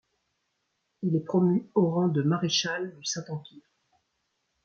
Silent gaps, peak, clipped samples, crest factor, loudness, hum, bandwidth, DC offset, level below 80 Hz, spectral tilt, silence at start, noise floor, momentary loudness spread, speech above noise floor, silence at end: none; -12 dBFS; under 0.1%; 18 dB; -27 LUFS; none; 7.8 kHz; under 0.1%; -74 dBFS; -5 dB/octave; 1 s; -78 dBFS; 10 LU; 51 dB; 1.05 s